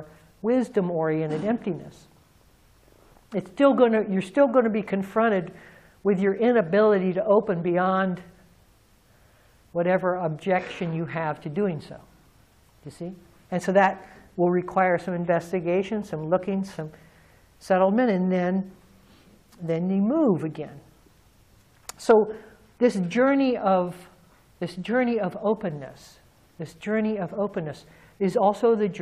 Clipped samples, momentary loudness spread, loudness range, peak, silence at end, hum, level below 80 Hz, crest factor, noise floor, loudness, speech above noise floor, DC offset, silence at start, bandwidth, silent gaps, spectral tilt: under 0.1%; 17 LU; 6 LU; -6 dBFS; 0 s; none; -62 dBFS; 18 dB; -59 dBFS; -24 LUFS; 35 dB; under 0.1%; 0 s; 13 kHz; none; -7.5 dB/octave